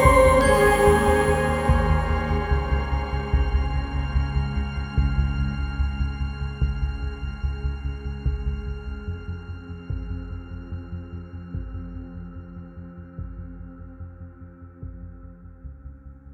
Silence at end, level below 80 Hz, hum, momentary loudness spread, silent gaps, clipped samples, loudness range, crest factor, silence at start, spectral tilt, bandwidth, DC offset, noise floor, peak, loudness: 0 s; -28 dBFS; none; 23 LU; none; under 0.1%; 18 LU; 22 dB; 0 s; -6.5 dB/octave; 17 kHz; under 0.1%; -43 dBFS; -2 dBFS; -24 LUFS